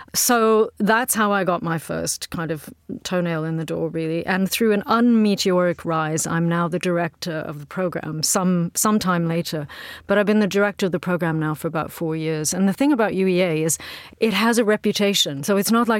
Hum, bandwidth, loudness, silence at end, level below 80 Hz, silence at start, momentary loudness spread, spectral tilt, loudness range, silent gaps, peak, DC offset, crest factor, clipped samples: none; 17 kHz; -21 LUFS; 0 s; -56 dBFS; 0 s; 8 LU; -4.5 dB/octave; 3 LU; none; -4 dBFS; under 0.1%; 16 dB; under 0.1%